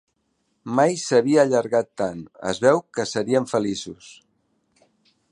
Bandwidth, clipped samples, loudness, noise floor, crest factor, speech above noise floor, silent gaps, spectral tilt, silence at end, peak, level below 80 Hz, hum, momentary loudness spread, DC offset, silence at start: 11 kHz; under 0.1%; -22 LUFS; -71 dBFS; 20 dB; 50 dB; none; -5 dB/octave; 1.2 s; -2 dBFS; -62 dBFS; none; 13 LU; under 0.1%; 0.65 s